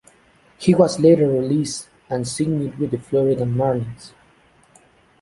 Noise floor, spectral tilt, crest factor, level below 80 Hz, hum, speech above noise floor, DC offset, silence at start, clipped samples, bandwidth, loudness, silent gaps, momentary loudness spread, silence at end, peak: -55 dBFS; -6.5 dB/octave; 18 dB; -54 dBFS; none; 36 dB; under 0.1%; 0.6 s; under 0.1%; 11.5 kHz; -19 LUFS; none; 13 LU; 1.15 s; -2 dBFS